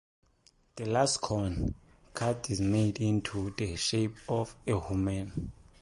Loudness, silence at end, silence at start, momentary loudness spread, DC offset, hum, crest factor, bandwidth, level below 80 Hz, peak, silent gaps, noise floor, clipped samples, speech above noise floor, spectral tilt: -32 LUFS; 0.3 s; 0.75 s; 12 LU; under 0.1%; none; 18 dB; 11.5 kHz; -48 dBFS; -14 dBFS; none; -66 dBFS; under 0.1%; 35 dB; -5 dB/octave